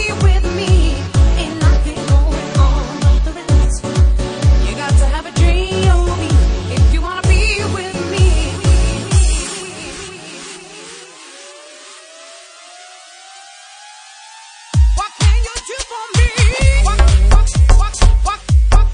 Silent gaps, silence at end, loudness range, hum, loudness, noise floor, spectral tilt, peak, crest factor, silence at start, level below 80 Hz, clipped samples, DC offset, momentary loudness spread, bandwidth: none; 0 s; 19 LU; none; -15 LUFS; -38 dBFS; -5 dB/octave; 0 dBFS; 14 dB; 0 s; -14 dBFS; under 0.1%; under 0.1%; 23 LU; 10.5 kHz